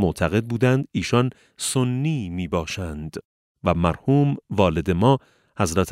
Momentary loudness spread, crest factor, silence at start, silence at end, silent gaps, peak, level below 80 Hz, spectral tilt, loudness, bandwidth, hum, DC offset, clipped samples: 9 LU; 18 dB; 0 s; 0 s; 3.25-3.55 s; -4 dBFS; -42 dBFS; -6 dB/octave; -22 LUFS; 15.5 kHz; none; under 0.1%; under 0.1%